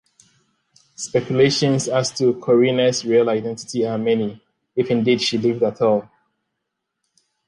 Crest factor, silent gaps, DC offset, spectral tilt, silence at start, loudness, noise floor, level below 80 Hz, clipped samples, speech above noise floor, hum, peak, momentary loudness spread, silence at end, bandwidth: 16 dB; none; under 0.1%; -5 dB/octave; 1 s; -19 LUFS; -78 dBFS; -62 dBFS; under 0.1%; 60 dB; none; -4 dBFS; 8 LU; 1.45 s; 11 kHz